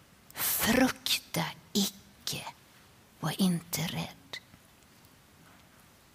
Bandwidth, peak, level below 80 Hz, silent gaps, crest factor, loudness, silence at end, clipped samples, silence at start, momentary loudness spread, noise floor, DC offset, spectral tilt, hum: 16 kHz; -12 dBFS; -60 dBFS; none; 22 dB; -31 LUFS; 1.75 s; under 0.1%; 0.35 s; 18 LU; -59 dBFS; under 0.1%; -3.5 dB/octave; none